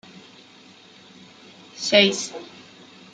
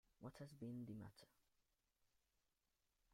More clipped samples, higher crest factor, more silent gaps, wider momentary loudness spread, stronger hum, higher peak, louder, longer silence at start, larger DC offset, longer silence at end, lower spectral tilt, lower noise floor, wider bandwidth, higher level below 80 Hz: neither; first, 24 dB vs 18 dB; neither; first, 26 LU vs 7 LU; neither; first, -2 dBFS vs -42 dBFS; first, -20 LUFS vs -57 LUFS; first, 1.75 s vs 0.2 s; neither; second, 0.7 s vs 1.85 s; second, -2.5 dB/octave vs -7 dB/octave; second, -49 dBFS vs -89 dBFS; second, 9.4 kHz vs 16 kHz; first, -74 dBFS vs -82 dBFS